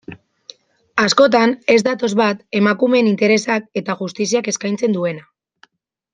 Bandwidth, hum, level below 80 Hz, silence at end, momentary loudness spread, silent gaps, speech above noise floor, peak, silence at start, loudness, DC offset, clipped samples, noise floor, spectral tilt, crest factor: 9.6 kHz; none; -62 dBFS; 0.95 s; 10 LU; none; 39 dB; -2 dBFS; 0.1 s; -16 LUFS; under 0.1%; under 0.1%; -55 dBFS; -4.5 dB/octave; 16 dB